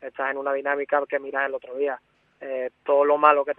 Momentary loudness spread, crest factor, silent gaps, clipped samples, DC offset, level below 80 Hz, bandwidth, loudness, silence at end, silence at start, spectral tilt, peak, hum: 13 LU; 22 dB; none; under 0.1%; under 0.1%; -78 dBFS; 3.9 kHz; -24 LUFS; 0.05 s; 0 s; -6.5 dB/octave; -2 dBFS; none